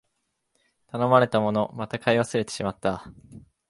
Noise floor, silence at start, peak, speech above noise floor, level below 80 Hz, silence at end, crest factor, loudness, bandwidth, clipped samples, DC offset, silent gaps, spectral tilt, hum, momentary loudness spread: -76 dBFS; 0.95 s; -4 dBFS; 52 dB; -58 dBFS; 0.3 s; 22 dB; -24 LUFS; 11.5 kHz; under 0.1%; under 0.1%; none; -6 dB/octave; none; 10 LU